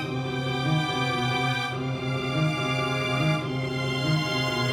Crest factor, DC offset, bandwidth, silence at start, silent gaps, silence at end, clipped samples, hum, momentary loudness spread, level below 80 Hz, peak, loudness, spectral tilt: 14 dB; under 0.1%; 15 kHz; 0 s; none; 0 s; under 0.1%; none; 4 LU; -54 dBFS; -12 dBFS; -26 LUFS; -5.5 dB/octave